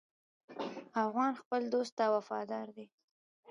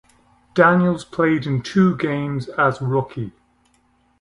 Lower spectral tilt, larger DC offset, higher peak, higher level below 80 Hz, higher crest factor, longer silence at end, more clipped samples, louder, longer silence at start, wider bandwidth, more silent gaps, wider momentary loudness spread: second, -5 dB/octave vs -7.5 dB/octave; neither; second, -20 dBFS vs 0 dBFS; second, under -90 dBFS vs -54 dBFS; about the same, 18 dB vs 20 dB; second, 0.65 s vs 0.9 s; neither; second, -36 LUFS vs -19 LUFS; about the same, 0.5 s vs 0.55 s; about the same, 11 kHz vs 11 kHz; first, 1.45-1.51 s, 1.92-1.97 s vs none; first, 14 LU vs 11 LU